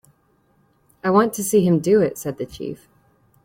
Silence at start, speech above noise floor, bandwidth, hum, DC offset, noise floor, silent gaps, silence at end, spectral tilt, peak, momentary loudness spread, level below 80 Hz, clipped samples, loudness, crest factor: 1.05 s; 43 dB; 16.5 kHz; none; under 0.1%; -62 dBFS; none; 0.7 s; -6 dB/octave; -4 dBFS; 16 LU; -58 dBFS; under 0.1%; -19 LUFS; 18 dB